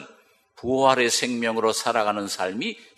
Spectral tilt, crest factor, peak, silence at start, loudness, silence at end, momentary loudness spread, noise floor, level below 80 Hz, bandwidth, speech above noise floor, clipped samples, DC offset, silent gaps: -2.5 dB/octave; 20 dB; -4 dBFS; 0 s; -23 LUFS; 0.15 s; 9 LU; -56 dBFS; -64 dBFS; 14.5 kHz; 32 dB; under 0.1%; under 0.1%; none